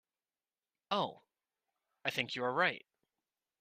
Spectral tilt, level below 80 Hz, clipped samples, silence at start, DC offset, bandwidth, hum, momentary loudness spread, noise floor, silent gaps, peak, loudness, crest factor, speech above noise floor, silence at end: -4 dB/octave; -82 dBFS; under 0.1%; 0.9 s; under 0.1%; 14 kHz; none; 9 LU; under -90 dBFS; none; -16 dBFS; -36 LUFS; 24 dB; over 55 dB; 0.85 s